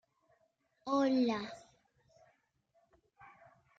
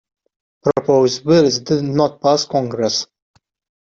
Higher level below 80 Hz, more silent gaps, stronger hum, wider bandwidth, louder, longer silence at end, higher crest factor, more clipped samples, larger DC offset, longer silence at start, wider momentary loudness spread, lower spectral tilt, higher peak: second, -80 dBFS vs -56 dBFS; neither; neither; about the same, 7.8 kHz vs 7.8 kHz; second, -33 LUFS vs -16 LUFS; second, 0.55 s vs 0.8 s; about the same, 18 dB vs 14 dB; neither; neither; first, 0.85 s vs 0.65 s; first, 19 LU vs 7 LU; about the same, -5.5 dB/octave vs -5 dB/octave; second, -20 dBFS vs -2 dBFS